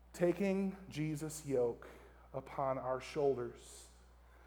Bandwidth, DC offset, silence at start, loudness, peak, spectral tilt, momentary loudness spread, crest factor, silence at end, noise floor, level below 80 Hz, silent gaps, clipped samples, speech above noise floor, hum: over 20 kHz; under 0.1%; 0.05 s; -39 LUFS; -20 dBFS; -6.5 dB/octave; 18 LU; 18 dB; 0 s; -61 dBFS; -62 dBFS; none; under 0.1%; 24 dB; none